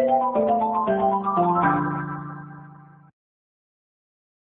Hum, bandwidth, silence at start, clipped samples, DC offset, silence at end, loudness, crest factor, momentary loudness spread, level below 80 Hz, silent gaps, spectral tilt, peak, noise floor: none; 3.9 kHz; 0 s; under 0.1%; under 0.1%; 1.8 s; -22 LUFS; 16 dB; 18 LU; -58 dBFS; none; -12 dB/octave; -8 dBFS; -47 dBFS